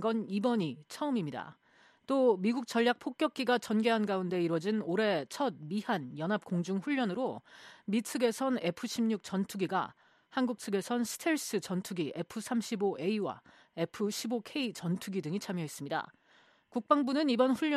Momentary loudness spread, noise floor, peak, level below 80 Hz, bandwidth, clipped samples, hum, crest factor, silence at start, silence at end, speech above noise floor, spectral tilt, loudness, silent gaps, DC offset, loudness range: 9 LU; -65 dBFS; -12 dBFS; -80 dBFS; 13.5 kHz; under 0.1%; none; 22 dB; 0 s; 0 s; 33 dB; -5 dB/octave; -33 LUFS; none; under 0.1%; 4 LU